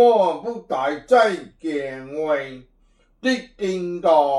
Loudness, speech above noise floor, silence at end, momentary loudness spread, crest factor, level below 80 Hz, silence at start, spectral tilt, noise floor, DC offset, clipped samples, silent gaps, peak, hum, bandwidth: -22 LUFS; 39 dB; 0 s; 12 LU; 16 dB; -58 dBFS; 0 s; -5 dB/octave; -59 dBFS; under 0.1%; under 0.1%; none; -4 dBFS; none; 11 kHz